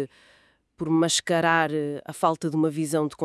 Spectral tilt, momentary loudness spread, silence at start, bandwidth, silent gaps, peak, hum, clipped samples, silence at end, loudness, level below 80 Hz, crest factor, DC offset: -4 dB/octave; 9 LU; 0 s; 12 kHz; none; -6 dBFS; none; under 0.1%; 0 s; -24 LUFS; -68 dBFS; 18 dB; under 0.1%